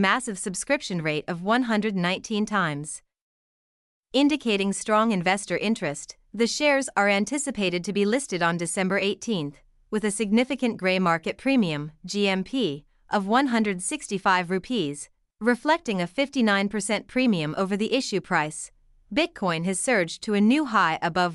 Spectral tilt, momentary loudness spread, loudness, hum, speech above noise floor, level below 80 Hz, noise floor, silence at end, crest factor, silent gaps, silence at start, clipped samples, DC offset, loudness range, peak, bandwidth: -4 dB/octave; 7 LU; -25 LUFS; none; over 66 dB; -60 dBFS; under -90 dBFS; 0 s; 18 dB; 3.21-4.03 s; 0 s; under 0.1%; under 0.1%; 2 LU; -8 dBFS; 12 kHz